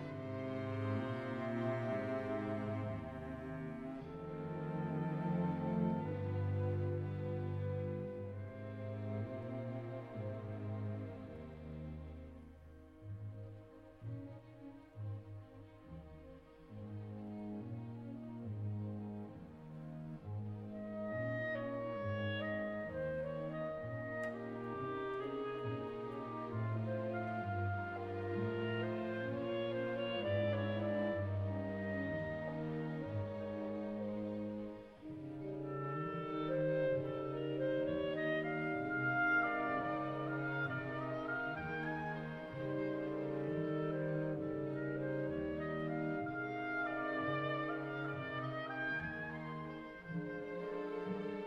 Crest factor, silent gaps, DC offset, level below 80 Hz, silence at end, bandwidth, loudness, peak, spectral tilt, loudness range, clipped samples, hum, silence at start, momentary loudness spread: 18 dB; none; under 0.1%; -66 dBFS; 0 s; 6.2 kHz; -41 LUFS; -24 dBFS; -9 dB/octave; 12 LU; under 0.1%; none; 0 s; 12 LU